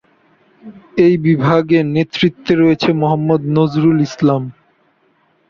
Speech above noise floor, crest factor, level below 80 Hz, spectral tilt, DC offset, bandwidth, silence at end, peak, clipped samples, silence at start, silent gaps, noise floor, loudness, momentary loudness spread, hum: 44 dB; 14 dB; -52 dBFS; -8 dB/octave; under 0.1%; 7 kHz; 1 s; -2 dBFS; under 0.1%; 0.65 s; none; -58 dBFS; -14 LUFS; 5 LU; none